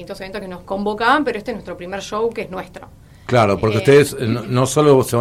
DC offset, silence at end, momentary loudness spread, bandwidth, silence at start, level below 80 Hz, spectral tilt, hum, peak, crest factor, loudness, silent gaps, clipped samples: under 0.1%; 0 s; 16 LU; 15.5 kHz; 0 s; -46 dBFS; -5.5 dB/octave; none; -2 dBFS; 16 dB; -17 LUFS; none; under 0.1%